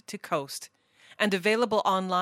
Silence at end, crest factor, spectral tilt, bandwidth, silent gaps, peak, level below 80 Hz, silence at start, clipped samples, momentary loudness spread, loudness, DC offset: 0 s; 20 dB; -4 dB/octave; 16 kHz; none; -8 dBFS; -74 dBFS; 0.1 s; under 0.1%; 14 LU; -27 LUFS; under 0.1%